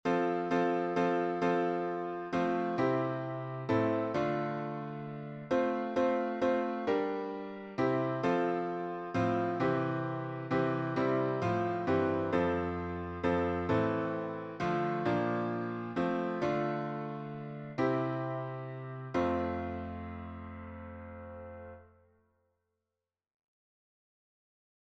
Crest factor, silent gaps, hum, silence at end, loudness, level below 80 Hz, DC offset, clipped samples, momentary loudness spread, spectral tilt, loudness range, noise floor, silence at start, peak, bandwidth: 16 dB; none; none; 3 s; -33 LUFS; -62 dBFS; under 0.1%; under 0.1%; 12 LU; -8 dB/octave; 7 LU; under -90 dBFS; 0.05 s; -16 dBFS; 8 kHz